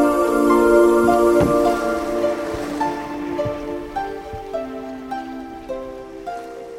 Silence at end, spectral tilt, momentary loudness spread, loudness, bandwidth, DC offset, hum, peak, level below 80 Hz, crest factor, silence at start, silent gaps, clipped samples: 0 s; -6 dB/octave; 17 LU; -19 LUFS; 16 kHz; under 0.1%; none; -2 dBFS; -42 dBFS; 18 dB; 0 s; none; under 0.1%